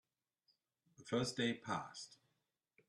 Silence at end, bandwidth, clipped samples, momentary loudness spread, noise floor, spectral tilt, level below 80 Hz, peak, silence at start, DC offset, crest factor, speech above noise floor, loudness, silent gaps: 0.75 s; 12 kHz; under 0.1%; 17 LU; -87 dBFS; -4.5 dB/octave; -78 dBFS; -26 dBFS; 1 s; under 0.1%; 20 dB; 46 dB; -41 LUFS; none